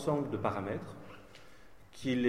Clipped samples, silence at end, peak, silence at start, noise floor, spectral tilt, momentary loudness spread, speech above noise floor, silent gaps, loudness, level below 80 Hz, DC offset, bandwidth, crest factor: under 0.1%; 0 s; -16 dBFS; 0 s; -58 dBFS; -6.5 dB/octave; 23 LU; 25 dB; none; -37 LUFS; -64 dBFS; 0.2%; 14 kHz; 20 dB